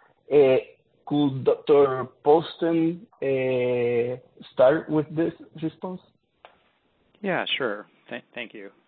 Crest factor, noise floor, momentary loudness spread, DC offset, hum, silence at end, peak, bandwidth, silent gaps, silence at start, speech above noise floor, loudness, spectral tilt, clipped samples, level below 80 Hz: 18 dB; -66 dBFS; 17 LU; under 0.1%; none; 0.2 s; -6 dBFS; 4.5 kHz; none; 0.3 s; 43 dB; -24 LUFS; -10.5 dB/octave; under 0.1%; -66 dBFS